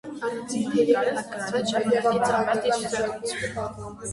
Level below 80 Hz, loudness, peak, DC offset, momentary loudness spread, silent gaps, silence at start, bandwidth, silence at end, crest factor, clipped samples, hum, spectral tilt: -56 dBFS; -25 LUFS; -8 dBFS; under 0.1%; 10 LU; none; 0.05 s; 11.5 kHz; 0 s; 18 dB; under 0.1%; none; -4 dB/octave